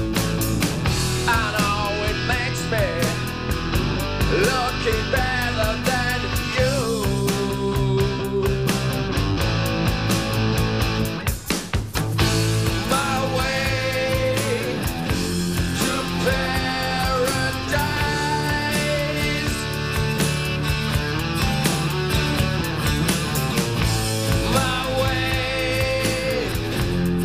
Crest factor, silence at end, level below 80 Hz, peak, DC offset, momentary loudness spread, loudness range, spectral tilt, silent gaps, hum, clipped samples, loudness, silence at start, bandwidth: 16 dB; 0 s; -32 dBFS; -6 dBFS; 0.4%; 3 LU; 1 LU; -4.5 dB/octave; none; none; under 0.1%; -22 LUFS; 0 s; 15.5 kHz